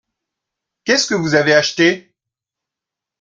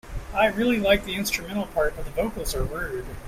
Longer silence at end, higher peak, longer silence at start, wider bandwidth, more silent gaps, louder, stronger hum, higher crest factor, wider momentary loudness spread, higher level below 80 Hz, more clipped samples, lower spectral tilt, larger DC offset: first, 1.2 s vs 0 s; first, 0 dBFS vs -6 dBFS; first, 0.85 s vs 0.05 s; second, 9.2 kHz vs 16 kHz; neither; first, -14 LUFS vs -25 LUFS; neither; about the same, 18 dB vs 20 dB; about the same, 11 LU vs 9 LU; second, -58 dBFS vs -36 dBFS; neither; about the same, -3.5 dB/octave vs -4 dB/octave; neither